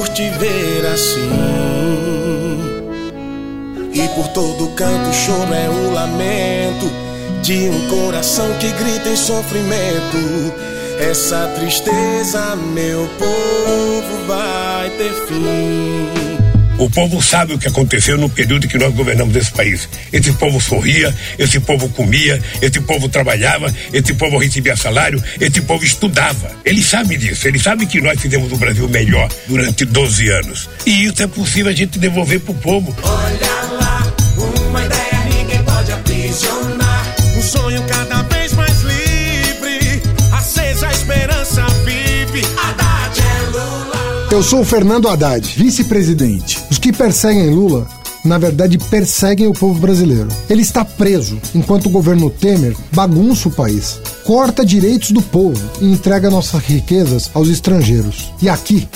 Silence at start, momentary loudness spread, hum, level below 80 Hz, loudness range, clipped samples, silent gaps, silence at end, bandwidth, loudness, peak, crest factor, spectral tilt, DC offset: 0 s; 7 LU; none; -26 dBFS; 4 LU; under 0.1%; none; 0.05 s; 16.5 kHz; -14 LUFS; 0 dBFS; 14 dB; -4.5 dB/octave; under 0.1%